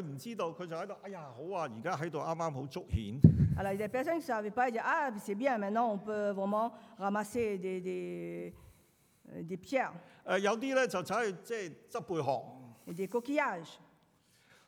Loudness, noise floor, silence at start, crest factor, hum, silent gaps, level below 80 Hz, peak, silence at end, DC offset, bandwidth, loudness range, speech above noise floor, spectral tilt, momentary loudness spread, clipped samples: -34 LUFS; -69 dBFS; 0 s; 28 dB; none; none; -56 dBFS; -6 dBFS; 0.9 s; under 0.1%; 17 kHz; 7 LU; 35 dB; -6.5 dB/octave; 12 LU; under 0.1%